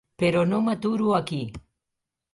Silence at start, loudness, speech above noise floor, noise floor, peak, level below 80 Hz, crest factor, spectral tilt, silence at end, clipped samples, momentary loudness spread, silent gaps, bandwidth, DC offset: 0.2 s; -24 LUFS; 61 dB; -85 dBFS; -10 dBFS; -56 dBFS; 16 dB; -7 dB/octave; 0.75 s; under 0.1%; 10 LU; none; 11.5 kHz; under 0.1%